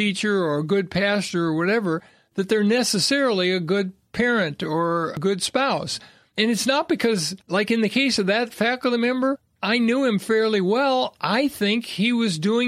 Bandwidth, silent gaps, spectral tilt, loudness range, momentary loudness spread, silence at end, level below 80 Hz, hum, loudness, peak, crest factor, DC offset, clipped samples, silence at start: 15.5 kHz; none; -4.5 dB/octave; 2 LU; 5 LU; 0 s; -62 dBFS; none; -22 LUFS; -6 dBFS; 16 dB; under 0.1%; under 0.1%; 0 s